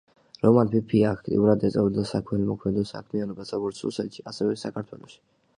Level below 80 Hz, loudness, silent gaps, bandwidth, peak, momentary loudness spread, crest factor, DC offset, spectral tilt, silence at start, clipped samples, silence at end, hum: -54 dBFS; -25 LUFS; none; 10.5 kHz; -6 dBFS; 12 LU; 20 dB; under 0.1%; -8 dB/octave; 0.45 s; under 0.1%; 0.45 s; none